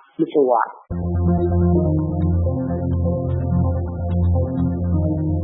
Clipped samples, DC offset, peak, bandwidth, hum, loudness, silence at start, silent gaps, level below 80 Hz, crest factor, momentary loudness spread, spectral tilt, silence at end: under 0.1%; under 0.1%; -4 dBFS; 3.6 kHz; none; -20 LUFS; 0.2 s; none; -32 dBFS; 14 dB; 6 LU; -14.5 dB/octave; 0 s